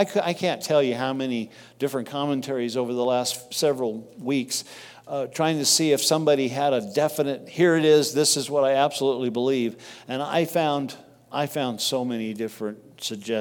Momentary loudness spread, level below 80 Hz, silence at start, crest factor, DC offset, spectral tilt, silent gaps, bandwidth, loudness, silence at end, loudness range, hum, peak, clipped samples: 13 LU; -74 dBFS; 0 s; 18 dB; under 0.1%; -3.5 dB/octave; none; 18 kHz; -24 LUFS; 0 s; 6 LU; none; -6 dBFS; under 0.1%